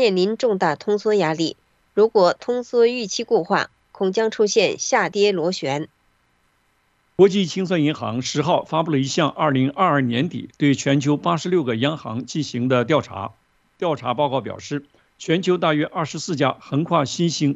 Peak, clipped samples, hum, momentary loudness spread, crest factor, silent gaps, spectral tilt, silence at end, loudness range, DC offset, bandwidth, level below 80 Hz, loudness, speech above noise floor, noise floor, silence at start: -4 dBFS; under 0.1%; none; 9 LU; 18 dB; none; -5 dB/octave; 0 s; 3 LU; under 0.1%; 8.2 kHz; -64 dBFS; -20 LUFS; 44 dB; -64 dBFS; 0 s